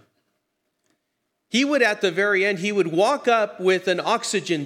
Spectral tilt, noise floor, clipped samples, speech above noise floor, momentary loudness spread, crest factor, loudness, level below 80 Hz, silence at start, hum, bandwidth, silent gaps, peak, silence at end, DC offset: -4 dB/octave; -76 dBFS; under 0.1%; 56 dB; 4 LU; 16 dB; -21 LUFS; -84 dBFS; 1.55 s; none; 14.5 kHz; none; -6 dBFS; 0 s; under 0.1%